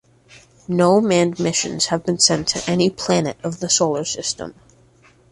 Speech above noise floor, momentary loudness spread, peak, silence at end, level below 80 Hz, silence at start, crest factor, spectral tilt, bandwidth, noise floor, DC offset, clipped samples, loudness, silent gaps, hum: 34 dB; 10 LU; 0 dBFS; 0.8 s; -54 dBFS; 0.35 s; 20 dB; -3.5 dB/octave; 11.5 kHz; -53 dBFS; under 0.1%; under 0.1%; -18 LUFS; none; none